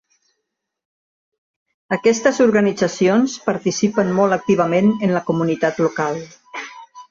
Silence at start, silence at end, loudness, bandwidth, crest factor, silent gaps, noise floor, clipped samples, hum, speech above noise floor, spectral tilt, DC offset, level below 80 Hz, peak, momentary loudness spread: 1.9 s; 0.1 s; -17 LUFS; 7.6 kHz; 16 dB; none; -78 dBFS; under 0.1%; none; 61 dB; -5.5 dB/octave; under 0.1%; -60 dBFS; -2 dBFS; 15 LU